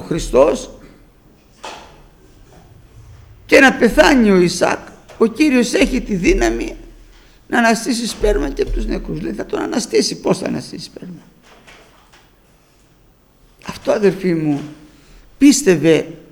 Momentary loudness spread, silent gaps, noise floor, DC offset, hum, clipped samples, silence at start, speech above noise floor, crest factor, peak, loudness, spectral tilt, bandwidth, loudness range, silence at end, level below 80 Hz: 21 LU; none; -51 dBFS; under 0.1%; none; under 0.1%; 0 s; 37 dB; 18 dB; 0 dBFS; -15 LUFS; -4.5 dB/octave; 19 kHz; 11 LU; 0.1 s; -32 dBFS